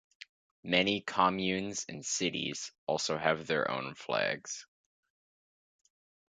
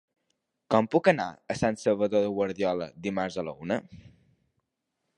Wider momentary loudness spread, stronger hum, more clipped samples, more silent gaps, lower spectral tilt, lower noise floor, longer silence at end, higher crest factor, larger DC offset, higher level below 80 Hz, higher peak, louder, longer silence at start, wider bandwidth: about the same, 10 LU vs 9 LU; neither; neither; first, 2.78-2.87 s vs none; second, -3 dB/octave vs -6 dB/octave; first, under -90 dBFS vs -82 dBFS; first, 1.65 s vs 1.1 s; about the same, 24 dB vs 24 dB; neither; second, -70 dBFS vs -60 dBFS; second, -12 dBFS vs -6 dBFS; second, -32 LUFS vs -28 LUFS; about the same, 0.65 s vs 0.7 s; second, 9.4 kHz vs 11 kHz